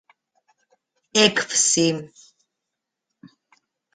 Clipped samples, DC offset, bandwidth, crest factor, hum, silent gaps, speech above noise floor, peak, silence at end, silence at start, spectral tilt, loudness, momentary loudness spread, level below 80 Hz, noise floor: under 0.1%; under 0.1%; 9.6 kHz; 24 dB; none; none; 63 dB; -2 dBFS; 1.9 s; 1.15 s; -2 dB/octave; -19 LUFS; 6 LU; -66 dBFS; -83 dBFS